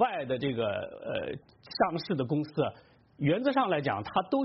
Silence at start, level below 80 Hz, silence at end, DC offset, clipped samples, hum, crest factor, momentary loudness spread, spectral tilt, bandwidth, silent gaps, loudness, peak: 0 s; -64 dBFS; 0 s; under 0.1%; under 0.1%; none; 18 dB; 9 LU; -5 dB/octave; 5.8 kHz; none; -31 LUFS; -12 dBFS